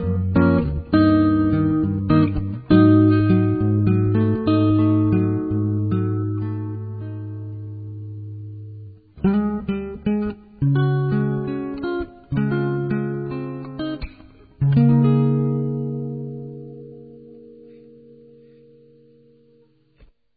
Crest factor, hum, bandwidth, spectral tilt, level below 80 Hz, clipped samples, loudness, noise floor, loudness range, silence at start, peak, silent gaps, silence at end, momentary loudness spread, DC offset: 18 dB; none; 4.8 kHz; -13.5 dB/octave; -40 dBFS; under 0.1%; -20 LUFS; -57 dBFS; 11 LU; 0 s; -4 dBFS; none; 2.65 s; 18 LU; under 0.1%